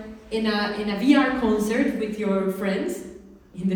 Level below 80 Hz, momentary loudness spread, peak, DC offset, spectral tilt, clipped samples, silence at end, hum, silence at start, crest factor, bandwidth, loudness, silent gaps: -50 dBFS; 12 LU; -6 dBFS; under 0.1%; -6 dB/octave; under 0.1%; 0 s; none; 0 s; 18 dB; 19.5 kHz; -23 LUFS; none